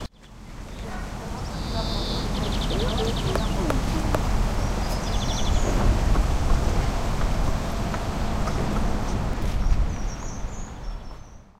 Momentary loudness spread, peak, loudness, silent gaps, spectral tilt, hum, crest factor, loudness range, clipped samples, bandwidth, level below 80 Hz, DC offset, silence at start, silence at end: 13 LU; -6 dBFS; -27 LUFS; none; -5.5 dB/octave; none; 18 dB; 3 LU; under 0.1%; 15 kHz; -26 dBFS; under 0.1%; 0 s; 0.2 s